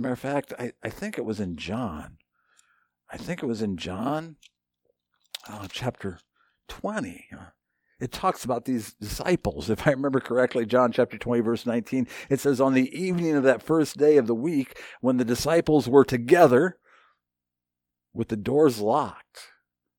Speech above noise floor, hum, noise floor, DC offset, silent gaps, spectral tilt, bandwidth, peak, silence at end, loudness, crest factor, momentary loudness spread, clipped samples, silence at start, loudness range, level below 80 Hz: 63 dB; 60 Hz at -55 dBFS; -87 dBFS; under 0.1%; none; -6 dB/octave; 18.5 kHz; -4 dBFS; 0.55 s; -25 LUFS; 22 dB; 17 LU; under 0.1%; 0 s; 12 LU; -54 dBFS